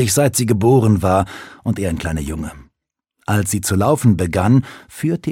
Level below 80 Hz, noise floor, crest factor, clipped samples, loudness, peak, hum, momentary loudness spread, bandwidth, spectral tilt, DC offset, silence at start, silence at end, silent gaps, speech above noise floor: -38 dBFS; -77 dBFS; 16 dB; under 0.1%; -17 LUFS; 0 dBFS; none; 13 LU; 16.5 kHz; -6 dB/octave; under 0.1%; 0 s; 0 s; none; 61 dB